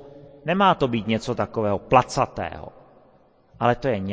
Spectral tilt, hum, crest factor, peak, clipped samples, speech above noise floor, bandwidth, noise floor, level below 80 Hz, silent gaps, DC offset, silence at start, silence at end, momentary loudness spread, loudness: -6 dB/octave; none; 22 dB; -2 dBFS; under 0.1%; 34 dB; 8 kHz; -56 dBFS; -48 dBFS; none; under 0.1%; 0 s; 0 s; 14 LU; -22 LUFS